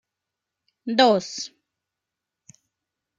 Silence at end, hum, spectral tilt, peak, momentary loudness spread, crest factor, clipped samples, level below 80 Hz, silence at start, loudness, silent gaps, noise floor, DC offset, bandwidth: 1.7 s; none; -3.5 dB/octave; -4 dBFS; 18 LU; 22 dB; under 0.1%; -78 dBFS; 0.85 s; -21 LUFS; none; -85 dBFS; under 0.1%; 9.2 kHz